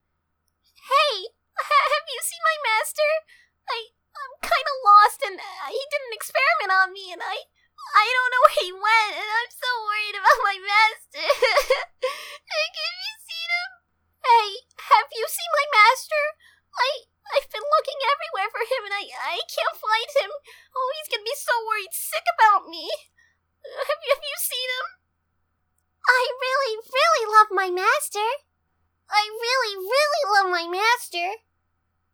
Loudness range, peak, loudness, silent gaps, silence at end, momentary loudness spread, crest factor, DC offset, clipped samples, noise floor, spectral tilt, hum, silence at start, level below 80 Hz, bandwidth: 5 LU; 0 dBFS; -22 LUFS; none; 0.75 s; 14 LU; 24 dB; under 0.1%; under 0.1%; -74 dBFS; 1 dB/octave; none; 0.85 s; -64 dBFS; over 20 kHz